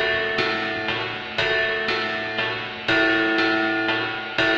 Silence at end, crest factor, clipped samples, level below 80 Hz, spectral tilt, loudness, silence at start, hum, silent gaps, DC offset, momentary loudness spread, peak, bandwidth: 0 s; 18 dB; under 0.1%; -54 dBFS; -4.5 dB/octave; -22 LUFS; 0 s; none; none; under 0.1%; 6 LU; -4 dBFS; 8.2 kHz